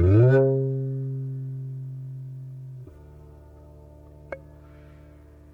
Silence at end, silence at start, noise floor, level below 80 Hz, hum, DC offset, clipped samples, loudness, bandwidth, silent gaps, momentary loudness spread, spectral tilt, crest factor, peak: 0.5 s; 0 s; -49 dBFS; -48 dBFS; 50 Hz at -60 dBFS; under 0.1%; under 0.1%; -24 LUFS; 3.9 kHz; none; 24 LU; -11 dB/octave; 16 dB; -10 dBFS